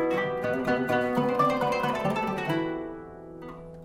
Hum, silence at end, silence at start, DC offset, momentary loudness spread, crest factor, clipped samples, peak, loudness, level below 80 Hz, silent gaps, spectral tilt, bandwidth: none; 0 s; 0 s; under 0.1%; 18 LU; 16 dB; under 0.1%; -12 dBFS; -27 LUFS; -56 dBFS; none; -6.5 dB/octave; 16.5 kHz